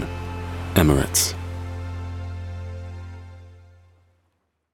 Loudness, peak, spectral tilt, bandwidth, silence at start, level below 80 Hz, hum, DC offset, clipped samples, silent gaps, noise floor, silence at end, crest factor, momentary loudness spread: -24 LUFS; -2 dBFS; -4.5 dB/octave; 18 kHz; 0 s; -38 dBFS; none; under 0.1%; under 0.1%; none; -71 dBFS; 1 s; 24 dB; 21 LU